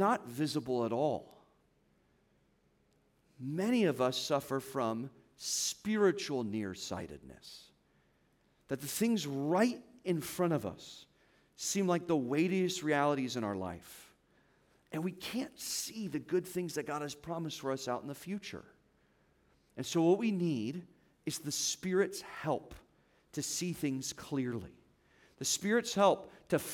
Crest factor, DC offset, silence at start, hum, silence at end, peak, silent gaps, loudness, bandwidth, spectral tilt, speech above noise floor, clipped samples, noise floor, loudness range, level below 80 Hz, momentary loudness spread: 22 dB; under 0.1%; 0 s; none; 0 s; -14 dBFS; none; -35 LUFS; 18 kHz; -4.5 dB/octave; 38 dB; under 0.1%; -72 dBFS; 5 LU; -72 dBFS; 14 LU